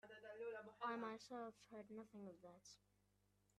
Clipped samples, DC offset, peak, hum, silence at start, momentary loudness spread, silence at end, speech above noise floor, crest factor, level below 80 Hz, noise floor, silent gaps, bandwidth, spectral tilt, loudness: under 0.1%; under 0.1%; -36 dBFS; 50 Hz at -75 dBFS; 0.05 s; 15 LU; 0.8 s; 27 dB; 20 dB; -88 dBFS; -82 dBFS; none; 13 kHz; -4.5 dB/octave; -54 LUFS